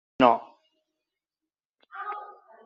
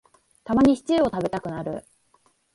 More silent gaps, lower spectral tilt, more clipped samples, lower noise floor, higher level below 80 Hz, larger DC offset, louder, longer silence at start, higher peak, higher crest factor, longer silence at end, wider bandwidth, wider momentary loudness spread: first, 1.65-1.74 s vs none; second, -3 dB/octave vs -6.5 dB/octave; neither; first, under -90 dBFS vs -64 dBFS; second, -68 dBFS vs -50 dBFS; neither; about the same, -25 LUFS vs -23 LUFS; second, 0.2 s vs 0.45 s; first, -4 dBFS vs -8 dBFS; first, 26 dB vs 16 dB; second, 0.35 s vs 0.75 s; second, 7.2 kHz vs 11.5 kHz; first, 24 LU vs 16 LU